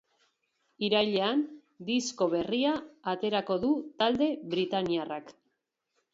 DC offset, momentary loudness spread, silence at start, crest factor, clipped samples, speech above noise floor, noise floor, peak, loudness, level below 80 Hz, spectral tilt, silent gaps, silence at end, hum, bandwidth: under 0.1%; 8 LU; 0.8 s; 18 dB; under 0.1%; 51 dB; -80 dBFS; -12 dBFS; -30 LUFS; -68 dBFS; -4.5 dB/octave; none; 0.8 s; none; 8 kHz